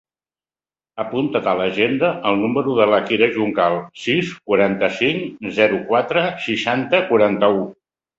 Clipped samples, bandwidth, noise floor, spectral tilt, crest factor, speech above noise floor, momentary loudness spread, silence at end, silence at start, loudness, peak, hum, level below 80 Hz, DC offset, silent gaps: under 0.1%; 8 kHz; under -90 dBFS; -6 dB/octave; 18 dB; over 72 dB; 7 LU; 0.45 s; 0.95 s; -18 LUFS; -2 dBFS; none; -58 dBFS; under 0.1%; none